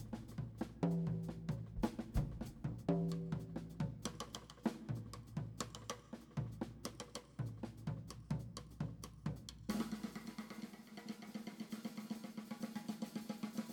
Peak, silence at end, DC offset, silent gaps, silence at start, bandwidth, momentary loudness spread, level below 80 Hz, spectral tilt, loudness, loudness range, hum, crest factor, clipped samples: -22 dBFS; 0 s; under 0.1%; none; 0 s; 18.5 kHz; 10 LU; -56 dBFS; -6 dB/octave; -46 LUFS; 6 LU; none; 22 dB; under 0.1%